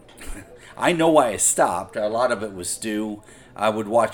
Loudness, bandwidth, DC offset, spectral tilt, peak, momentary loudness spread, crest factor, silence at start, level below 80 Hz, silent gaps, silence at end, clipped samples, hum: -21 LUFS; 19 kHz; 0.1%; -3.5 dB/octave; -4 dBFS; 22 LU; 18 dB; 0.2 s; -48 dBFS; none; 0 s; under 0.1%; none